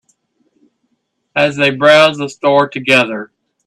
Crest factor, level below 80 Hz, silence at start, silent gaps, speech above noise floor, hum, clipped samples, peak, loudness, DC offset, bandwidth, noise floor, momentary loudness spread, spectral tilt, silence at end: 14 dB; -60 dBFS; 1.35 s; none; 55 dB; none; under 0.1%; 0 dBFS; -12 LUFS; under 0.1%; 12.5 kHz; -67 dBFS; 11 LU; -4.5 dB/octave; 0.4 s